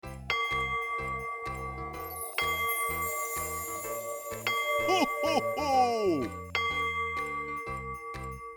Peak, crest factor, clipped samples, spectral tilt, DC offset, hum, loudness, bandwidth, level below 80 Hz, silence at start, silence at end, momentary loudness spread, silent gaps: -14 dBFS; 18 dB; under 0.1%; -3 dB/octave; under 0.1%; none; -31 LUFS; over 20 kHz; -52 dBFS; 0.05 s; 0 s; 10 LU; none